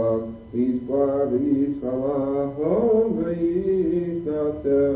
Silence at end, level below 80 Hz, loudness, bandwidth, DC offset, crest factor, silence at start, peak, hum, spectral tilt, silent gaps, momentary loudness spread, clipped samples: 0 s; -48 dBFS; -23 LUFS; 4 kHz; under 0.1%; 12 dB; 0 s; -10 dBFS; none; -13 dB/octave; none; 5 LU; under 0.1%